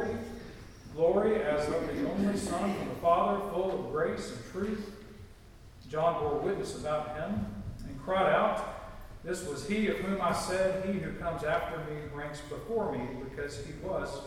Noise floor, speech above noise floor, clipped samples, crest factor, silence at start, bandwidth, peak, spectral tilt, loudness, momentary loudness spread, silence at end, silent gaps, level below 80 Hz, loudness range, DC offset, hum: -52 dBFS; 20 dB; under 0.1%; 20 dB; 0 s; 16.5 kHz; -12 dBFS; -5.5 dB/octave; -32 LUFS; 15 LU; 0 s; none; -50 dBFS; 5 LU; under 0.1%; none